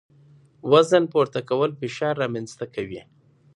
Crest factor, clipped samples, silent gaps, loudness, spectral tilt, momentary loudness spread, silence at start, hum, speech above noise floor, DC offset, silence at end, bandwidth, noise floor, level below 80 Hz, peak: 20 dB; under 0.1%; none; -22 LUFS; -5.5 dB/octave; 16 LU; 0.65 s; none; 32 dB; under 0.1%; 0.55 s; 11 kHz; -54 dBFS; -64 dBFS; -4 dBFS